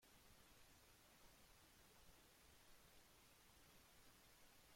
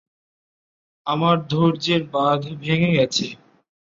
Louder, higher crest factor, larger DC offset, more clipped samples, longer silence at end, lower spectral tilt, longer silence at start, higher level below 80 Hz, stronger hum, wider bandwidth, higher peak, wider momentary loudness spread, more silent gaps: second, -70 LUFS vs -20 LUFS; about the same, 16 dB vs 18 dB; neither; neither; second, 0 s vs 0.6 s; second, -2.5 dB/octave vs -5.5 dB/octave; second, 0 s vs 1.05 s; second, -78 dBFS vs -58 dBFS; neither; first, 16.5 kHz vs 7.6 kHz; second, -54 dBFS vs -4 dBFS; second, 0 LU vs 7 LU; neither